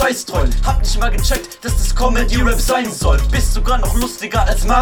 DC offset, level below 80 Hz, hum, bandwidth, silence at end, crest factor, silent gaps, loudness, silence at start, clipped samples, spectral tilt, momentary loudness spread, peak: 0.6%; -16 dBFS; none; 18.5 kHz; 0 s; 14 dB; none; -17 LUFS; 0 s; under 0.1%; -4.5 dB/octave; 4 LU; 0 dBFS